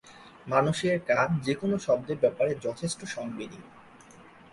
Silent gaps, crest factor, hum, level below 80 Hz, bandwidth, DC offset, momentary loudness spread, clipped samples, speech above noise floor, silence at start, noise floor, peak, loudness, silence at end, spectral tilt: none; 20 dB; none; -62 dBFS; 11.5 kHz; under 0.1%; 13 LU; under 0.1%; 25 dB; 0.05 s; -52 dBFS; -8 dBFS; -28 LUFS; 0.3 s; -5.5 dB/octave